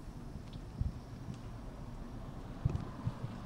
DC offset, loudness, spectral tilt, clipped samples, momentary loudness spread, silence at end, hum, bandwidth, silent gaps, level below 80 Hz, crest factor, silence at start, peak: under 0.1%; -44 LUFS; -7.5 dB/octave; under 0.1%; 10 LU; 0 s; none; 15.5 kHz; none; -48 dBFS; 24 dB; 0 s; -18 dBFS